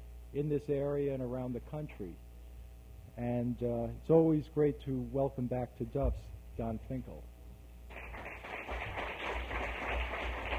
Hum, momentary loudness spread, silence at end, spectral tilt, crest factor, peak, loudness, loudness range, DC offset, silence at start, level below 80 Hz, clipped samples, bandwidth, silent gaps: none; 21 LU; 0 s; -8 dB/octave; 22 dB; -14 dBFS; -36 LUFS; 8 LU; under 0.1%; 0 s; -46 dBFS; under 0.1%; 16 kHz; none